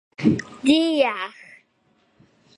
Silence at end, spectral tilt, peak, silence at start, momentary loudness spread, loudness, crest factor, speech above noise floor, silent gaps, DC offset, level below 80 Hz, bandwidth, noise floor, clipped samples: 1.3 s; -5.5 dB/octave; -4 dBFS; 0.2 s; 11 LU; -21 LUFS; 20 dB; 44 dB; none; under 0.1%; -58 dBFS; 11 kHz; -64 dBFS; under 0.1%